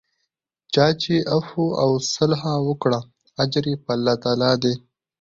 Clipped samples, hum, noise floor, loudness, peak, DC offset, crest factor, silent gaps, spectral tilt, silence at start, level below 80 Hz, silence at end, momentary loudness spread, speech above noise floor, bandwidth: under 0.1%; none; -78 dBFS; -21 LUFS; -4 dBFS; under 0.1%; 18 dB; none; -5.5 dB/octave; 0.7 s; -56 dBFS; 0.4 s; 6 LU; 57 dB; 7.8 kHz